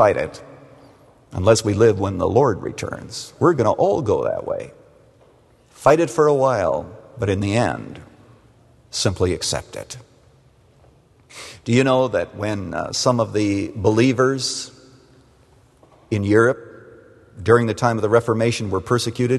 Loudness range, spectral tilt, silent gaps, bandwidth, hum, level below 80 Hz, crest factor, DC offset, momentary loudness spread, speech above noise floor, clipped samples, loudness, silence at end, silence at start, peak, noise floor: 5 LU; -5.5 dB/octave; none; 12.5 kHz; none; -50 dBFS; 20 dB; under 0.1%; 16 LU; 35 dB; under 0.1%; -19 LUFS; 0 s; 0 s; 0 dBFS; -53 dBFS